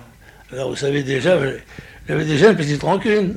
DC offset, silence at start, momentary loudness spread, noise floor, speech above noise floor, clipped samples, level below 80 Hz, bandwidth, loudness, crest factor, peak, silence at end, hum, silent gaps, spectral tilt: under 0.1%; 0.5 s; 20 LU; -44 dBFS; 27 dB; under 0.1%; -46 dBFS; 12 kHz; -18 LUFS; 18 dB; 0 dBFS; 0 s; none; none; -6 dB/octave